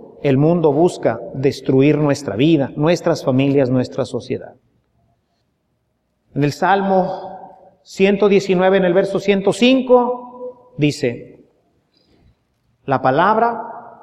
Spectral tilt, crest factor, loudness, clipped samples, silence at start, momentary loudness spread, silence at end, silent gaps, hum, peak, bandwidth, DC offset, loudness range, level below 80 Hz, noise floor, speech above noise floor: -6.5 dB/octave; 16 dB; -16 LUFS; under 0.1%; 0 s; 15 LU; 0.15 s; none; none; -2 dBFS; 12.5 kHz; under 0.1%; 6 LU; -56 dBFS; -68 dBFS; 52 dB